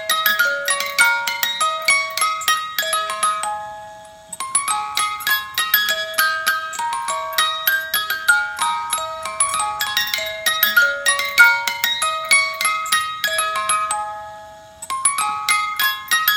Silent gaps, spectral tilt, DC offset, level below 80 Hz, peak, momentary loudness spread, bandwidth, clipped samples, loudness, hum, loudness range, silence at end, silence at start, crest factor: none; 2 dB/octave; under 0.1%; -60 dBFS; 0 dBFS; 9 LU; 17 kHz; under 0.1%; -18 LUFS; none; 4 LU; 0 s; 0 s; 20 dB